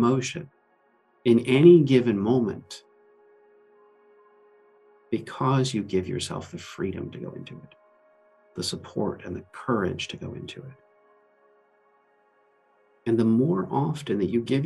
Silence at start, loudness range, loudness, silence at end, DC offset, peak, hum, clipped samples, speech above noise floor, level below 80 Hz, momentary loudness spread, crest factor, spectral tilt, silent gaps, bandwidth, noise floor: 0 s; 12 LU; -24 LUFS; 0 s; under 0.1%; -4 dBFS; none; under 0.1%; 41 dB; -64 dBFS; 20 LU; 22 dB; -6.5 dB/octave; none; 12 kHz; -65 dBFS